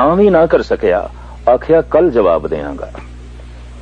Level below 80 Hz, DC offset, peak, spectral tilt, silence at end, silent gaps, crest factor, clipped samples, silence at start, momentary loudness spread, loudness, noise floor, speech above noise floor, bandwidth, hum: -32 dBFS; under 0.1%; 0 dBFS; -8 dB/octave; 0 s; none; 14 dB; under 0.1%; 0 s; 19 LU; -13 LUFS; -31 dBFS; 19 dB; 8.2 kHz; 60 Hz at -30 dBFS